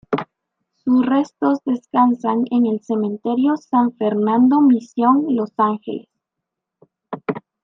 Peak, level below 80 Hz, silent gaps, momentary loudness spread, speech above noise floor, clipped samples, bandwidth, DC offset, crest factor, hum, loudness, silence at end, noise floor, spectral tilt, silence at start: -4 dBFS; -70 dBFS; none; 13 LU; 65 dB; under 0.1%; 6.8 kHz; under 0.1%; 16 dB; none; -18 LUFS; 0.25 s; -82 dBFS; -8 dB/octave; 0.1 s